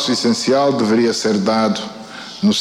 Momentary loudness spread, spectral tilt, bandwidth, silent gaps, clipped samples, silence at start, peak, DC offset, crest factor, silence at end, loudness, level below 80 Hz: 14 LU; -4.5 dB/octave; 12.5 kHz; none; under 0.1%; 0 s; -4 dBFS; under 0.1%; 12 dB; 0 s; -16 LUFS; -58 dBFS